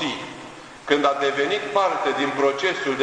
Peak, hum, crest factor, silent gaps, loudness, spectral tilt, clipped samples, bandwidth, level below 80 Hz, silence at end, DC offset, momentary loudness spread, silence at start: -4 dBFS; none; 18 dB; none; -22 LUFS; -3.5 dB/octave; under 0.1%; 10.5 kHz; -62 dBFS; 0 s; under 0.1%; 16 LU; 0 s